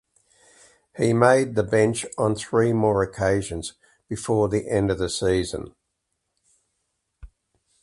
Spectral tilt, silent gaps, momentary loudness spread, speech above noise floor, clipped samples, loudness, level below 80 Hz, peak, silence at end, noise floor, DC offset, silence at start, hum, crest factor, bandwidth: -5.5 dB/octave; none; 15 LU; 56 dB; under 0.1%; -22 LUFS; -46 dBFS; -2 dBFS; 0.55 s; -77 dBFS; under 0.1%; 0.95 s; none; 22 dB; 11.5 kHz